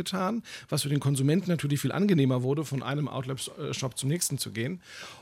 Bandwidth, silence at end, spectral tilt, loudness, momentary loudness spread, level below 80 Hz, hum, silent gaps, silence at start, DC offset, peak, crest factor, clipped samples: 16 kHz; 0 s; -5.5 dB/octave; -29 LUFS; 10 LU; -68 dBFS; none; none; 0 s; under 0.1%; -12 dBFS; 16 dB; under 0.1%